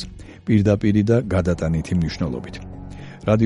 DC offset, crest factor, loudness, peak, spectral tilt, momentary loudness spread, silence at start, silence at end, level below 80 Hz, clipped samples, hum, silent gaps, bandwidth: under 0.1%; 16 dB; -20 LUFS; -4 dBFS; -8 dB/octave; 18 LU; 0 s; 0 s; -38 dBFS; under 0.1%; none; none; 11 kHz